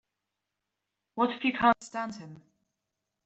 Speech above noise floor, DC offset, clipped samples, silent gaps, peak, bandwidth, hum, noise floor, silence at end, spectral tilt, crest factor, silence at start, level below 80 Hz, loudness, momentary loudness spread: 57 dB; under 0.1%; under 0.1%; none; -8 dBFS; 8.2 kHz; none; -86 dBFS; 0.9 s; -4.5 dB/octave; 24 dB; 1.15 s; -66 dBFS; -29 LUFS; 20 LU